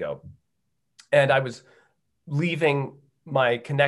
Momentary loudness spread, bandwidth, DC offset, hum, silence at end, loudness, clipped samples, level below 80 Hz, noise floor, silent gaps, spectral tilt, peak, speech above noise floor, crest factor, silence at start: 16 LU; 11.5 kHz; under 0.1%; none; 0 s; -24 LUFS; under 0.1%; -68 dBFS; -79 dBFS; none; -6.5 dB/octave; -6 dBFS; 56 dB; 20 dB; 0 s